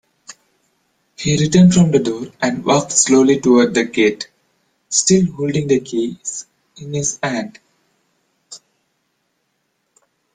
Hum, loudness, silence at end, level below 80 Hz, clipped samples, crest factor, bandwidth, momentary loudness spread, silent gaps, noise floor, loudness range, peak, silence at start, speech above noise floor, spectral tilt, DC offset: none; -15 LUFS; 1.8 s; -52 dBFS; under 0.1%; 16 dB; 9.6 kHz; 15 LU; none; -69 dBFS; 13 LU; 0 dBFS; 0.3 s; 54 dB; -4.5 dB/octave; under 0.1%